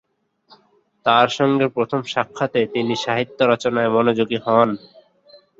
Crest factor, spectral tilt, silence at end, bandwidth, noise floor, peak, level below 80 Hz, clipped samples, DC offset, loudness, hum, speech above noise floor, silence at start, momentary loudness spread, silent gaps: 20 dB; -5.5 dB/octave; 0.85 s; 7.8 kHz; -59 dBFS; 0 dBFS; -62 dBFS; under 0.1%; under 0.1%; -19 LUFS; none; 41 dB; 1.05 s; 7 LU; none